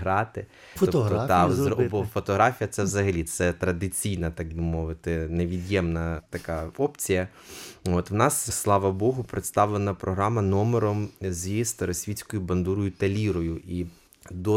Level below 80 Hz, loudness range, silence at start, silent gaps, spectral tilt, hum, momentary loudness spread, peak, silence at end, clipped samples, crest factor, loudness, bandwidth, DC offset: -44 dBFS; 4 LU; 0 s; none; -5.5 dB/octave; none; 10 LU; -6 dBFS; 0 s; under 0.1%; 20 dB; -26 LUFS; 16.5 kHz; under 0.1%